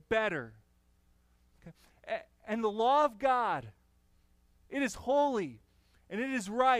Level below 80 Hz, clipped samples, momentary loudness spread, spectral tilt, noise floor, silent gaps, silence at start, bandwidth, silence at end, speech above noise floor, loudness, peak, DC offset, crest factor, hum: -64 dBFS; under 0.1%; 13 LU; -4.5 dB/octave; -68 dBFS; none; 0.1 s; 15 kHz; 0 s; 38 dB; -32 LUFS; -14 dBFS; under 0.1%; 20 dB; 60 Hz at -70 dBFS